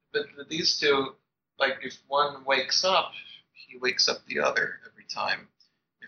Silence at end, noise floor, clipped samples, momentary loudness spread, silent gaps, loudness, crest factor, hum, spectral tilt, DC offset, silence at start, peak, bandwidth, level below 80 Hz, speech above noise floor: 0 s; -57 dBFS; under 0.1%; 14 LU; none; -26 LUFS; 20 dB; none; -1.5 dB/octave; under 0.1%; 0.15 s; -8 dBFS; 7.2 kHz; -74 dBFS; 30 dB